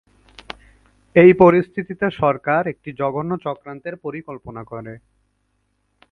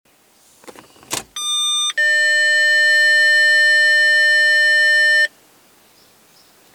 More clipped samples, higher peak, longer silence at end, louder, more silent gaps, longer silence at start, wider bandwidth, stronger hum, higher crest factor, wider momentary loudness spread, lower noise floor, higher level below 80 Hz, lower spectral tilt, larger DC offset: neither; first, 0 dBFS vs -6 dBFS; second, 1.15 s vs 1.45 s; second, -17 LUFS vs -12 LUFS; neither; first, 1.15 s vs 0.65 s; second, 5.2 kHz vs 18.5 kHz; first, 50 Hz at -55 dBFS vs none; first, 20 dB vs 10 dB; first, 24 LU vs 9 LU; first, -68 dBFS vs -53 dBFS; first, -52 dBFS vs -68 dBFS; first, -9.5 dB/octave vs 2.5 dB/octave; neither